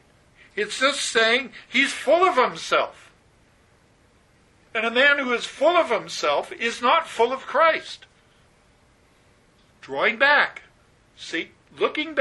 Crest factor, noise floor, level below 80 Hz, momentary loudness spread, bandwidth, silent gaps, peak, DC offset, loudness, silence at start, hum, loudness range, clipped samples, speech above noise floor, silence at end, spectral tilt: 20 dB; -58 dBFS; -64 dBFS; 13 LU; 11.5 kHz; none; -2 dBFS; under 0.1%; -21 LUFS; 0.55 s; none; 4 LU; under 0.1%; 37 dB; 0 s; -1.5 dB/octave